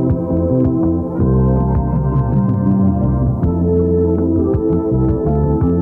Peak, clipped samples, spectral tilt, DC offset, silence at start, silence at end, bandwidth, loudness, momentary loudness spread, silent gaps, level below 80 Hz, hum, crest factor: -4 dBFS; under 0.1%; -13.5 dB/octave; under 0.1%; 0 s; 0 s; 2.2 kHz; -15 LUFS; 2 LU; none; -24 dBFS; none; 10 dB